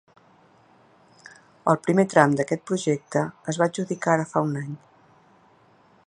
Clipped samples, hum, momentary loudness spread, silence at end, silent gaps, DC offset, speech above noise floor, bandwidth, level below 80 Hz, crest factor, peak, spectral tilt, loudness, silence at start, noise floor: under 0.1%; none; 10 LU; 1.3 s; none; under 0.1%; 35 dB; 11.5 kHz; -68 dBFS; 24 dB; 0 dBFS; -6 dB/octave; -23 LUFS; 1.65 s; -58 dBFS